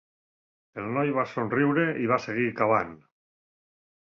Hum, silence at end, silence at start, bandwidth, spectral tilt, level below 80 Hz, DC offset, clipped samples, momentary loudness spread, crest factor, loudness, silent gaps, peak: none; 1.2 s; 0.75 s; 7 kHz; -8 dB/octave; -66 dBFS; under 0.1%; under 0.1%; 11 LU; 20 dB; -26 LUFS; none; -10 dBFS